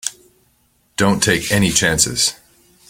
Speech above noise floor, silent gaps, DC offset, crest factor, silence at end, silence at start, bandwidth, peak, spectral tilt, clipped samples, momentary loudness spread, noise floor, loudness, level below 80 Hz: 44 dB; none; under 0.1%; 20 dB; 0.55 s; 0.05 s; 17 kHz; 0 dBFS; -3 dB/octave; under 0.1%; 8 LU; -60 dBFS; -15 LUFS; -42 dBFS